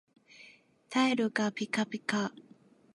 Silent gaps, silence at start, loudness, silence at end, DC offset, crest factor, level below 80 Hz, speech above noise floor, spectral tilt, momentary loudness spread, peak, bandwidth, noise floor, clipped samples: none; 0.4 s; -31 LUFS; 0.65 s; under 0.1%; 22 dB; -80 dBFS; 28 dB; -4.5 dB/octave; 8 LU; -12 dBFS; 11.5 kHz; -59 dBFS; under 0.1%